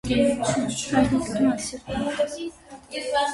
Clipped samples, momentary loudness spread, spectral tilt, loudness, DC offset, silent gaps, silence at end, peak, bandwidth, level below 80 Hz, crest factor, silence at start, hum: under 0.1%; 12 LU; -4.5 dB/octave; -24 LUFS; under 0.1%; none; 0 s; -8 dBFS; 11.5 kHz; -46 dBFS; 16 dB; 0.05 s; none